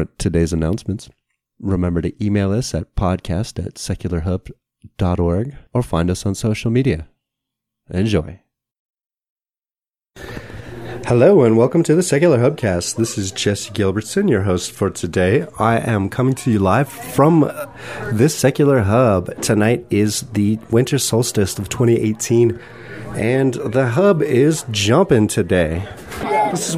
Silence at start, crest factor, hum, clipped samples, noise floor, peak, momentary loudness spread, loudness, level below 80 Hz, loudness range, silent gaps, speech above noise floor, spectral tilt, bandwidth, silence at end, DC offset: 0 s; 18 dB; none; under 0.1%; under -90 dBFS; 0 dBFS; 13 LU; -17 LUFS; -38 dBFS; 6 LU; 8.79-8.89 s, 9.06-9.10 s, 9.30-9.36 s, 9.90-9.94 s; over 73 dB; -6 dB/octave; 16 kHz; 0 s; under 0.1%